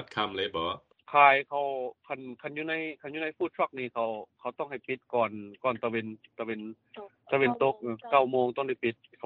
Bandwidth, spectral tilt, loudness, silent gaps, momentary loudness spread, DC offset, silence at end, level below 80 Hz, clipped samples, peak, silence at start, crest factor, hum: 5.4 kHz; -7 dB/octave; -30 LUFS; none; 15 LU; under 0.1%; 0.3 s; -72 dBFS; under 0.1%; -8 dBFS; 0 s; 24 dB; none